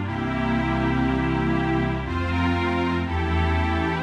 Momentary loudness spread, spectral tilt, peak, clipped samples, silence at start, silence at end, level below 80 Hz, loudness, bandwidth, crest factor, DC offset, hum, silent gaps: 3 LU; -7.5 dB/octave; -10 dBFS; under 0.1%; 0 s; 0 s; -32 dBFS; -23 LUFS; 8.8 kHz; 12 dB; under 0.1%; none; none